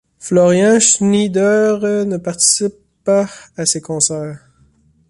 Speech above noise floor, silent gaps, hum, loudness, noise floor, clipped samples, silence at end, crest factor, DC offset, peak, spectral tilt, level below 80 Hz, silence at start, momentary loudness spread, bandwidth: 39 dB; none; none; -14 LUFS; -53 dBFS; under 0.1%; 0.75 s; 16 dB; under 0.1%; 0 dBFS; -3.5 dB/octave; -56 dBFS; 0.2 s; 12 LU; 11.5 kHz